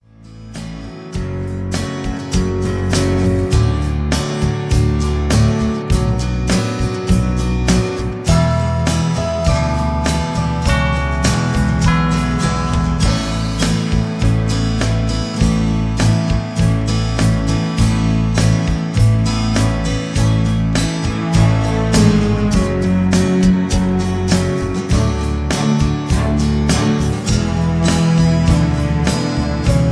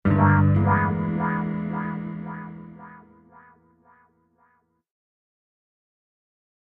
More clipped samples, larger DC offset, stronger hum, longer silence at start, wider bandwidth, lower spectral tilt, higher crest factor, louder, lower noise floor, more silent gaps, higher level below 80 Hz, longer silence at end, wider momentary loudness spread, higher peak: neither; neither; neither; first, 0.2 s vs 0.05 s; first, 11 kHz vs 3.5 kHz; second, -6 dB/octave vs -12 dB/octave; second, 14 dB vs 22 dB; first, -16 LUFS vs -23 LUFS; second, -37 dBFS vs -66 dBFS; neither; first, -22 dBFS vs -50 dBFS; second, 0 s vs 3.7 s; second, 5 LU vs 22 LU; first, 0 dBFS vs -4 dBFS